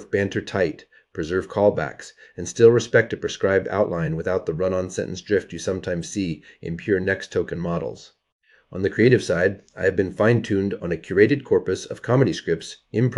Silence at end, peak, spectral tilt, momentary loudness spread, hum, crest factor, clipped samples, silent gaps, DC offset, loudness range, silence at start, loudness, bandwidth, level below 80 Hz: 0 s; -2 dBFS; -6 dB/octave; 13 LU; none; 20 dB; under 0.1%; 8.32-8.39 s; under 0.1%; 5 LU; 0 s; -22 LUFS; 11.5 kHz; -52 dBFS